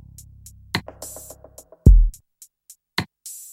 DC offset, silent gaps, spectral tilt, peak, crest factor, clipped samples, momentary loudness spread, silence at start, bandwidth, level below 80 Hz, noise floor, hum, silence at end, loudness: under 0.1%; none; -5.5 dB/octave; 0 dBFS; 20 dB; under 0.1%; 24 LU; 0.75 s; 15.5 kHz; -22 dBFS; -53 dBFS; none; 0.5 s; -21 LUFS